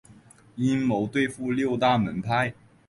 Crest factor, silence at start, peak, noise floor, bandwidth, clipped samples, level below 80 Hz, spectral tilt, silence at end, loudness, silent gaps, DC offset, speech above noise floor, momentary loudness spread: 16 dB; 0.1 s; -10 dBFS; -53 dBFS; 11.5 kHz; under 0.1%; -56 dBFS; -6.5 dB/octave; 0.35 s; -25 LUFS; none; under 0.1%; 28 dB; 6 LU